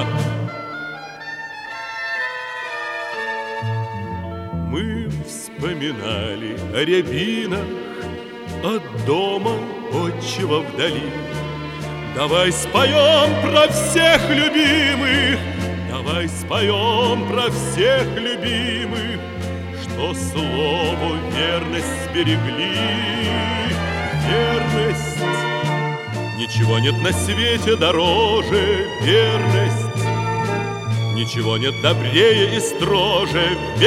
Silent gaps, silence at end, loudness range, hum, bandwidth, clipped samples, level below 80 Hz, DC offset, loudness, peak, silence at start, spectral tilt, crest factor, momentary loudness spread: none; 0 s; 10 LU; none; 16 kHz; under 0.1%; -44 dBFS; under 0.1%; -19 LUFS; -2 dBFS; 0 s; -4.5 dB/octave; 18 dB; 13 LU